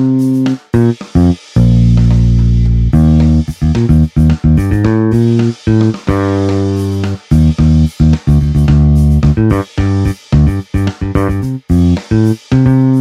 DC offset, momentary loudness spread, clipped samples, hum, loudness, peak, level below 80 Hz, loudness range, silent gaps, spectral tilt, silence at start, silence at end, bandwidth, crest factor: under 0.1%; 5 LU; under 0.1%; none; -11 LUFS; 0 dBFS; -18 dBFS; 2 LU; none; -8.5 dB/octave; 0 s; 0 s; 12 kHz; 10 dB